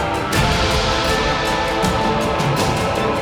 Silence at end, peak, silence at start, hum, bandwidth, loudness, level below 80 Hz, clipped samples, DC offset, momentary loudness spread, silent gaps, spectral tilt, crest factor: 0 s; -4 dBFS; 0 s; none; over 20 kHz; -18 LUFS; -30 dBFS; under 0.1%; under 0.1%; 2 LU; none; -4.5 dB/octave; 12 dB